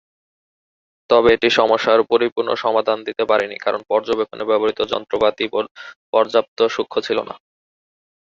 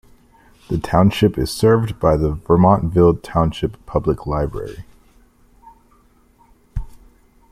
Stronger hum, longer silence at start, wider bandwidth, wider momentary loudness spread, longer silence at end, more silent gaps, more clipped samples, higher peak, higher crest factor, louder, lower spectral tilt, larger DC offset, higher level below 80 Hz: neither; first, 1.1 s vs 0.7 s; second, 7.4 kHz vs 15 kHz; second, 8 LU vs 19 LU; first, 0.95 s vs 0.6 s; first, 2.32-2.36 s, 5.71-5.75 s, 5.96-6.13 s, 6.48-6.57 s vs none; neither; about the same, -2 dBFS vs -2 dBFS; about the same, 18 dB vs 16 dB; about the same, -18 LUFS vs -17 LUFS; second, -4.5 dB/octave vs -7.5 dB/octave; neither; second, -56 dBFS vs -34 dBFS